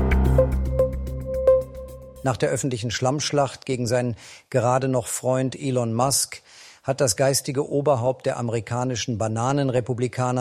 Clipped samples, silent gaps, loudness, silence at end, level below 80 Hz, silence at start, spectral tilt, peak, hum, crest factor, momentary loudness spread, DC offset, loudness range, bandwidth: under 0.1%; none; -23 LUFS; 0 s; -32 dBFS; 0 s; -5 dB/octave; -6 dBFS; none; 18 dB; 9 LU; under 0.1%; 1 LU; 15.5 kHz